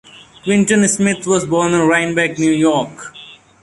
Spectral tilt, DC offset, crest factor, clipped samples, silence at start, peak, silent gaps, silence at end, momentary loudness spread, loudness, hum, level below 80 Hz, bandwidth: -4.5 dB/octave; under 0.1%; 14 dB; under 0.1%; 0.45 s; -2 dBFS; none; 0.3 s; 14 LU; -14 LUFS; none; -52 dBFS; 11.5 kHz